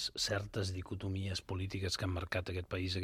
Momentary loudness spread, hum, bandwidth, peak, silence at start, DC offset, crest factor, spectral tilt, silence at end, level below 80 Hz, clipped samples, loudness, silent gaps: 5 LU; none; 15 kHz; -22 dBFS; 0 s; under 0.1%; 18 dB; -4.5 dB/octave; 0 s; -56 dBFS; under 0.1%; -38 LUFS; none